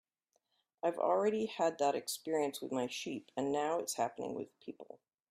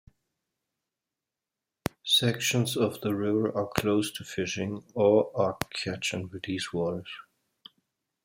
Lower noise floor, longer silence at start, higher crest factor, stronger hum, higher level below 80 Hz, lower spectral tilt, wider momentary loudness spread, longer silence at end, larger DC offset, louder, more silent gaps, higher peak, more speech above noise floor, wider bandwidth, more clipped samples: second, -82 dBFS vs -89 dBFS; second, 0.85 s vs 2.05 s; second, 18 dB vs 26 dB; neither; second, -82 dBFS vs -62 dBFS; about the same, -3.5 dB/octave vs -4.5 dB/octave; first, 15 LU vs 12 LU; second, 0.45 s vs 1.05 s; neither; second, -36 LUFS vs -28 LUFS; neither; second, -20 dBFS vs -4 dBFS; second, 46 dB vs 61 dB; about the same, 15.5 kHz vs 16 kHz; neither